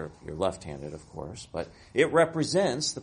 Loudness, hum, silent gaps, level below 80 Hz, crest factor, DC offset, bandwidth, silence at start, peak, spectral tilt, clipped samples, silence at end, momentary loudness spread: -27 LUFS; none; none; -54 dBFS; 22 dB; under 0.1%; 10.5 kHz; 0 s; -8 dBFS; -4 dB/octave; under 0.1%; 0 s; 17 LU